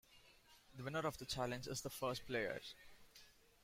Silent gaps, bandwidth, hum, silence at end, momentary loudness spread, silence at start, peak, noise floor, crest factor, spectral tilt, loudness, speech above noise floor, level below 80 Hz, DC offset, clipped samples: none; 16 kHz; none; 0.3 s; 21 LU; 0.1 s; -28 dBFS; -68 dBFS; 20 dB; -4 dB/octave; -45 LUFS; 23 dB; -68 dBFS; under 0.1%; under 0.1%